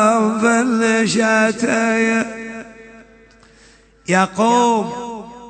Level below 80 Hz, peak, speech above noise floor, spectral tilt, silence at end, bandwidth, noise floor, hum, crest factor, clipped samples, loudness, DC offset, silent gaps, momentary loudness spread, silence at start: -56 dBFS; -2 dBFS; 33 dB; -4.5 dB/octave; 0 s; 9.2 kHz; -49 dBFS; none; 16 dB; under 0.1%; -16 LUFS; under 0.1%; none; 16 LU; 0 s